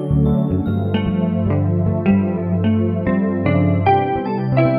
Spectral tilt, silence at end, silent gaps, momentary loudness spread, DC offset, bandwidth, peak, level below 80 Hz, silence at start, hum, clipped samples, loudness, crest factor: -11.5 dB/octave; 0 s; none; 4 LU; under 0.1%; 5 kHz; -2 dBFS; -36 dBFS; 0 s; none; under 0.1%; -18 LUFS; 14 dB